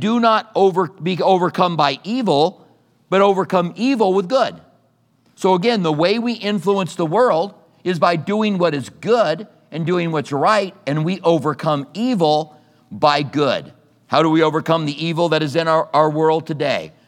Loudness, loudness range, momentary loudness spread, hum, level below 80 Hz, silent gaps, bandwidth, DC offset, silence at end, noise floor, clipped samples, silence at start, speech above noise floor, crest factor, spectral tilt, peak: -18 LUFS; 2 LU; 6 LU; none; -72 dBFS; none; 14.5 kHz; under 0.1%; 0.2 s; -59 dBFS; under 0.1%; 0 s; 42 dB; 16 dB; -6 dB/octave; 0 dBFS